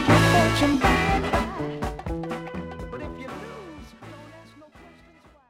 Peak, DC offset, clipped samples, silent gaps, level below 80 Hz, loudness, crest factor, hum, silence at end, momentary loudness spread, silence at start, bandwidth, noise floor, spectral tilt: -6 dBFS; under 0.1%; under 0.1%; none; -38 dBFS; -23 LUFS; 20 dB; none; 0.6 s; 24 LU; 0 s; 16.5 kHz; -54 dBFS; -5.5 dB/octave